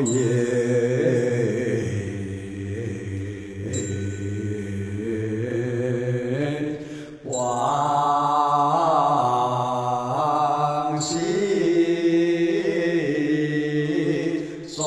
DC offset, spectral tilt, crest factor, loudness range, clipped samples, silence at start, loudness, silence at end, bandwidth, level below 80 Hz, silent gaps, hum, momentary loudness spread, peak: under 0.1%; -6 dB/octave; 14 dB; 7 LU; under 0.1%; 0 s; -23 LUFS; 0 s; 11 kHz; -56 dBFS; none; none; 10 LU; -8 dBFS